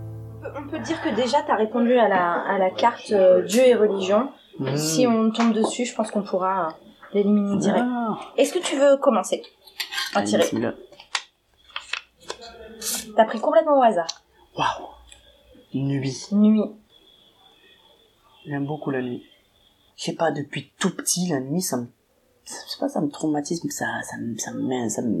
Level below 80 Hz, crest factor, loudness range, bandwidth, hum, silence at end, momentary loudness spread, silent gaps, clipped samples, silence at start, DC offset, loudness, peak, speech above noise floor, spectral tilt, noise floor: -62 dBFS; 20 dB; 8 LU; 15 kHz; none; 0 s; 15 LU; none; under 0.1%; 0 s; under 0.1%; -23 LUFS; -2 dBFS; 41 dB; -4.5 dB/octave; -63 dBFS